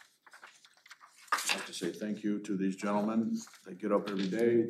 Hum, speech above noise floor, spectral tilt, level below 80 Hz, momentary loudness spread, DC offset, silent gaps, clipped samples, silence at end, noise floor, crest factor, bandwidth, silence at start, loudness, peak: none; 26 dB; -4.5 dB/octave; under -90 dBFS; 13 LU; under 0.1%; none; under 0.1%; 0 s; -58 dBFS; 20 dB; 15 kHz; 0.35 s; -34 LUFS; -14 dBFS